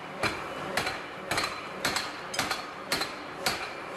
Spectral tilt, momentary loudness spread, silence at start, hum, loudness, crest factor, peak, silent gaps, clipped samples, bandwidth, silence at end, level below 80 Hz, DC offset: -2 dB/octave; 4 LU; 0 s; none; -31 LUFS; 20 dB; -12 dBFS; none; under 0.1%; 14 kHz; 0 s; -58 dBFS; under 0.1%